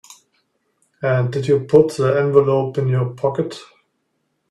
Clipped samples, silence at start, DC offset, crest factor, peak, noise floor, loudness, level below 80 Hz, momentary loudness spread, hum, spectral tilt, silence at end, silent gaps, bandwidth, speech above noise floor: under 0.1%; 0.1 s; under 0.1%; 18 dB; 0 dBFS; -70 dBFS; -18 LUFS; -58 dBFS; 11 LU; none; -7.5 dB/octave; 0.9 s; none; 11.5 kHz; 53 dB